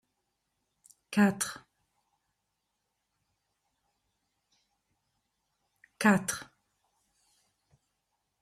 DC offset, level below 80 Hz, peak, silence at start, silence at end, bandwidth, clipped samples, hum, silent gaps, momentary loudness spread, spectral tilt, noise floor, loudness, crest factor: under 0.1%; -74 dBFS; -10 dBFS; 1.1 s; 2 s; 15 kHz; under 0.1%; none; none; 13 LU; -4.5 dB/octave; -83 dBFS; -29 LUFS; 26 dB